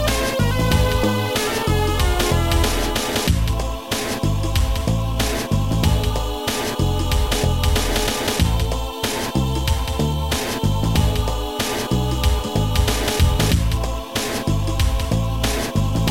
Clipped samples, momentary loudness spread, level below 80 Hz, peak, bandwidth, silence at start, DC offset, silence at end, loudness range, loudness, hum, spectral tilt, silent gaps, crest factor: under 0.1%; 5 LU; -24 dBFS; -4 dBFS; 17 kHz; 0 s; 1%; 0 s; 2 LU; -20 LUFS; none; -4.5 dB/octave; none; 16 dB